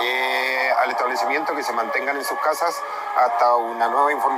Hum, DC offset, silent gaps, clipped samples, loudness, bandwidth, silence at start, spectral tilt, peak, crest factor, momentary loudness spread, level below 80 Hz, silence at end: none; under 0.1%; none; under 0.1%; -21 LUFS; 16 kHz; 0 s; -1 dB/octave; -6 dBFS; 14 dB; 5 LU; -78 dBFS; 0 s